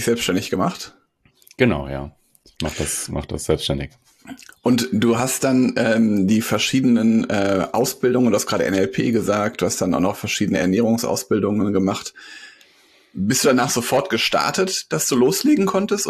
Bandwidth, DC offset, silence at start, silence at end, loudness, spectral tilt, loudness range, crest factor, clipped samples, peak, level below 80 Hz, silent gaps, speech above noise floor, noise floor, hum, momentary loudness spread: 14 kHz; under 0.1%; 0 s; 0 s; -19 LUFS; -4.5 dB/octave; 6 LU; 18 dB; under 0.1%; -2 dBFS; -46 dBFS; none; 39 dB; -58 dBFS; none; 11 LU